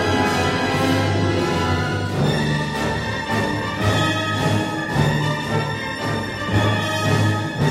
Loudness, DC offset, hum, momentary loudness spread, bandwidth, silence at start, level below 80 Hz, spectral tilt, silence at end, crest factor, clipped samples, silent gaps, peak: -20 LUFS; under 0.1%; none; 4 LU; 15.5 kHz; 0 s; -40 dBFS; -5.5 dB/octave; 0 s; 16 dB; under 0.1%; none; -4 dBFS